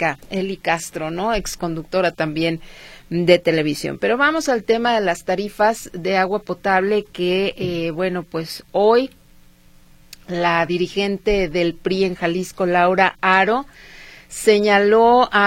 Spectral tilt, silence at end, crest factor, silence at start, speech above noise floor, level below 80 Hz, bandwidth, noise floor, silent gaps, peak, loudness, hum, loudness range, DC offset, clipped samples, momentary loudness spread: -5 dB/octave; 0 s; 18 dB; 0 s; 30 dB; -44 dBFS; 16.5 kHz; -48 dBFS; none; 0 dBFS; -19 LUFS; none; 4 LU; under 0.1%; under 0.1%; 11 LU